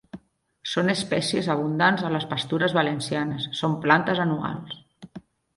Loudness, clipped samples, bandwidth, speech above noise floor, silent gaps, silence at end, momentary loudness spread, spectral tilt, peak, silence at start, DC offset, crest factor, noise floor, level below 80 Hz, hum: -24 LUFS; under 0.1%; 11.5 kHz; 27 dB; none; 0.4 s; 17 LU; -5 dB/octave; -2 dBFS; 0.15 s; under 0.1%; 22 dB; -51 dBFS; -62 dBFS; none